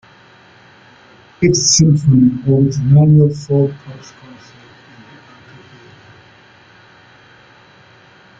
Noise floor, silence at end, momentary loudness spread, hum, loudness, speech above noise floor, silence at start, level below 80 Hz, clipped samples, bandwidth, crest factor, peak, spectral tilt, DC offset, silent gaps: -45 dBFS; 4.4 s; 13 LU; none; -12 LUFS; 34 dB; 1.4 s; -46 dBFS; under 0.1%; 7.8 kHz; 16 dB; 0 dBFS; -5.5 dB/octave; under 0.1%; none